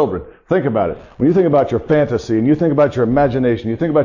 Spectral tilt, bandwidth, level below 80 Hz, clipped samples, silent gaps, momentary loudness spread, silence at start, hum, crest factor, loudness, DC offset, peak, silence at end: -8.5 dB/octave; 7.4 kHz; -42 dBFS; under 0.1%; none; 6 LU; 0 s; none; 14 dB; -16 LUFS; under 0.1%; -2 dBFS; 0 s